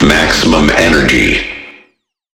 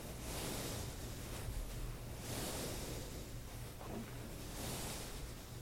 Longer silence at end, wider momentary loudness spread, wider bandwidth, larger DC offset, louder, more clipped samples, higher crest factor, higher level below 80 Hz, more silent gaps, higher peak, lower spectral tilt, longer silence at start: first, 0.7 s vs 0 s; first, 11 LU vs 7 LU; first, 18.5 kHz vs 16.5 kHz; neither; first, -9 LUFS vs -46 LUFS; neither; second, 10 dB vs 16 dB; first, -24 dBFS vs -50 dBFS; neither; first, 0 dBFS vs -30 dBFS; about the same, -4 dB/octave vs -4 dB/octave; about the same, 0 s vs 0 s